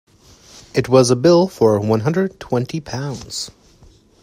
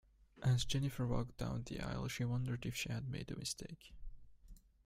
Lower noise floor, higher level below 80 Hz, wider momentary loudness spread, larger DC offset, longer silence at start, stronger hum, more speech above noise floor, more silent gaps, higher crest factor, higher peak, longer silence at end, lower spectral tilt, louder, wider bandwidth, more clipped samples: second, -49 dBFS vs -60 dBFS; about the same, -50 dBFS vs -54 dBFS; about the same, 13 LU vs 12 LU; neither; first, 0.55 s vs 0.35 s; neither; first, 33 dB vs 20 dB; neither; about the same, 18 dB vs 18 dB; first, 0 dBFS vs -24 dBFS; first, 0.7 s vs 0.3 s; about the same, -6 dB/octave vs -5 dB/octave; first, -17 LUFS vs -41 LUFS; about the same, 15.5 kHz vs 16 kHz; neither